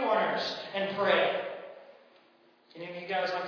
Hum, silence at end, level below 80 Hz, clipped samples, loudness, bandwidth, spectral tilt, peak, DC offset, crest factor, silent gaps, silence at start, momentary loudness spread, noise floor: none; 0 s; -80 dBFS; under 0.1%; -30 LUFS; 5.4 kHz; -4.5 dB/octave; -14 dBFS; under 0.1%; 18 dB; none; 0 s; 19 LU; -63 dBFS